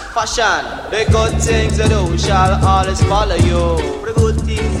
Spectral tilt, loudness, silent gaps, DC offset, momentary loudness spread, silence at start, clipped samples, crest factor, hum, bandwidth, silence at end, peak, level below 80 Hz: -5 dB/octave; -15 LUFS; none; under 0.1%; 5 LU; 0 s; under 0.1%; 14 dB; none; 12 kHz; 0 s; 0 dBFS; -20 dBFS